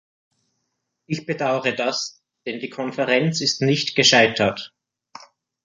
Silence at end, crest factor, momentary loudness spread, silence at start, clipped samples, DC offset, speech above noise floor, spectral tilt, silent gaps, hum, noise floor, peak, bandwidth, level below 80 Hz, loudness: 0.95 s; 20 dB; 17 LU; 1.1 s; under 0.1%; under 0.1%; 56 dB; -3.5 dB/octave; none; none; -76 dBFS; -2 dBFS; 10 kHz; -62 dBFS; -20 LUFS